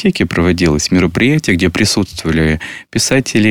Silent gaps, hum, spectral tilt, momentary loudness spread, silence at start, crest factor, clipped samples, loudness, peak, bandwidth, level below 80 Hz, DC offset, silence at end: none; none; -4.5 dB/octave; 4 LU; 0 s; 12 dB; under 0.1%; -13 LUFS; -2 dBFS; 19.5 kHz; -30 dBFS; 0.6%; 0 s